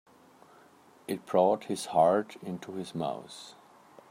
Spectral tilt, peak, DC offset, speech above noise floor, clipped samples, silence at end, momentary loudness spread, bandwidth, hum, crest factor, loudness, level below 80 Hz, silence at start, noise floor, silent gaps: -5.5 dB/octave; -10 dBFS; under 0.1%; 29 dB; under 0.1%; 0.6 s; 21 LU; 16 kHz; none; 20 dB; -30 LUFS; -78 dBFS; 1.1 s; -59 dBFS; none